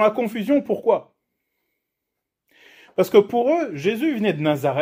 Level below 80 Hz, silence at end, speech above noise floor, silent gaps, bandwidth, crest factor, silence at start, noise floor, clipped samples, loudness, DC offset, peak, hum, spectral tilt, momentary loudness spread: -68 dBFS; 0 s; 62 dB; none; 16 kHz; 20 dB; 0 s; -82 dBFS; under 0.1%; -21 LUFS; under 0.1%; -2 dBFS; none; -6.5 dB/octave; 7 LU